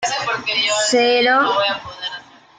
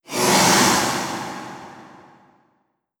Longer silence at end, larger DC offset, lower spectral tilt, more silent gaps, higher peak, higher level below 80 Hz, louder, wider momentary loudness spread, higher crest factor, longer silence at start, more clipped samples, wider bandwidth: second, 0.4 s vs 1.15 s; neither; second, -1 dB/octave vs -2.5 dB/octave; neither; about the same, -4 dBFS vs -2 dBFS; about the same, -62 dBFS vs -58 dBFS; about the same, -16 LUFS vs -17 LUFS; second, 14 LU vs 21 LU; second, 14 dB vs 20 dB; about the same, 0 s vs 0.1 s; neither; second, 9.6 kHz vs over 20 kHz